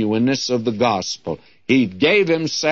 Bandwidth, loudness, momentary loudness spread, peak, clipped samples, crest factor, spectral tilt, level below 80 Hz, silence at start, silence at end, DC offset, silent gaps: 7.8 kHz; -18 LUFS; 11 LU; -4 dBFS; under 0.1%; 16 dB; -4.5 dB/octave; -58 dBFS; 0 s; 0 s; 0.2%; none